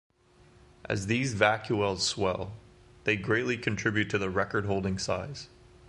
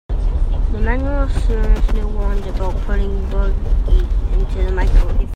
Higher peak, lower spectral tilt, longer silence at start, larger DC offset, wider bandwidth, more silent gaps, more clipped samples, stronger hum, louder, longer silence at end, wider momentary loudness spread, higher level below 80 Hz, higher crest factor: second, -6 dBFS vs -2 dBFS; second, -4.5 dB/octave vs -7.5 dB/octave; first, 0.85 s vs 0.1 s; neither; first, 11.5 kHz vs 4.9 kHz; neither; neither; neither; second, -29 LUFS vs -20 LUFS; first, 0.4 s vs 0 s; first, 10 LU vs 4 LU; second, -52 dBFS vs -16 dBFS; first, 24 dB vs 12 dB